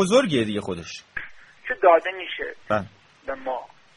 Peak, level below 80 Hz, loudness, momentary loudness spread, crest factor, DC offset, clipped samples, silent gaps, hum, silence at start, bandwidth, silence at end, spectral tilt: -4 dBFS; -56 dBFS; -24 LUFS; 19 LU; 20 dB; under 0.1%; under 0.1%; none; none; 0 s; 11.5 kHz; 0.3 s; -5 dB/octave